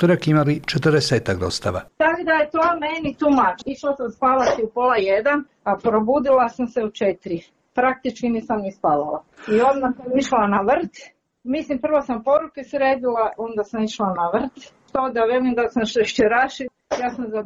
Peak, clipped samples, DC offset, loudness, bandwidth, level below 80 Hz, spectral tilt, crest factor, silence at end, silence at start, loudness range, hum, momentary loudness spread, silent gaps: -8 dBFS; under 0.1%; under 0.1%; -20 LUFS; 12 kHz; -52 dBFS; -6 dB/octave; 12 dB; 0 s; 0 s; 3 LU; none; 9 LU; none